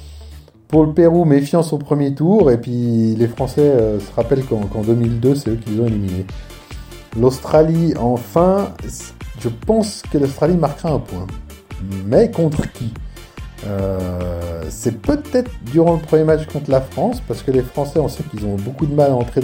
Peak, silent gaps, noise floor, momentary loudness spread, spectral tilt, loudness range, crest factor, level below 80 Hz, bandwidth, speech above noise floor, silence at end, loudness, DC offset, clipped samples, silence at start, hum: 0 dBFS; none; -38 dBFS; 16 LU; -8 dB/octave; 5 LU; 16 dB; -34 dBFS; 16.5 kHz; 22 dB; 0 s; -17 LUFS; under 0.1%; under 0.1%; 0 s; none